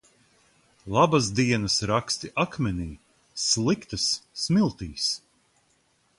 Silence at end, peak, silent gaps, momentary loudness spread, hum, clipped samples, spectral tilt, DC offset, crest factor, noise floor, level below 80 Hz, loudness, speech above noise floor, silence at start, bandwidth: 1 s; -6 dBFS; none; 8 LU; none; under 0.1%; -4 dB/octave; under 0.1%; 20 dB; -67 dBFS; -50 dBFS; -25 LUFS; 42 dB; 0.85 s; 11.5 kHz